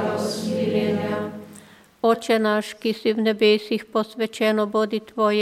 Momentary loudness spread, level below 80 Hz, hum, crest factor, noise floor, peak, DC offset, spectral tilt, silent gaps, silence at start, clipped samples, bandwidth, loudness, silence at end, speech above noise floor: 8 LU; -68 dBFS; none; 16 dB; -48 dBFS; -6 dBFS; under 0.1%; -5 dB/octave; none; 0 s; under 0.1%; 15 kHz; -22 LUFS; 0 s; 26 dB